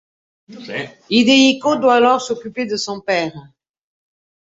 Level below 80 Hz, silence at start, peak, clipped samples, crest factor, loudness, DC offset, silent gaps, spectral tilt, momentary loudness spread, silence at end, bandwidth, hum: -62 dBFS; 0.5 s; -2 dBFS; under 0.1%; 16 dB; -15 LUFS; under 0.1%; none; -3.5 dB/octave; 16 LU; 1 s; 7.8 kHz; none